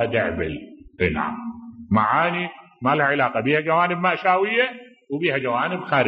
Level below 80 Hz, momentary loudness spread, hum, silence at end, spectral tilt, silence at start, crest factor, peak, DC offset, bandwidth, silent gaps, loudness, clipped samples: -50 dBFS; 13 LU; none; 0 s; -9 dB/octave; 0 s; 18 dB; -4 dBFS; under 0.1%; 5.8 kHz; none; -21 LUFS; under 0.1%